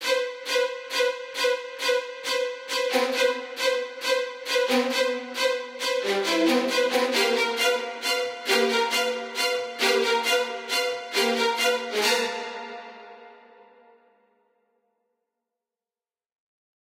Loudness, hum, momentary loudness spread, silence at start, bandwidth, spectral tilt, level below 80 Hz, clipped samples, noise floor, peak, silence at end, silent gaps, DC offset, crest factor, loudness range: -24 LUFS; none; 6 LU; 0 s; 16 kHz; -0.5 dB/octave; -82 dBFS; under 0.1%; under -90 dBFS; -8 dBFS; 3.5 s; none; under 0.1%; 18 dB; 4 LU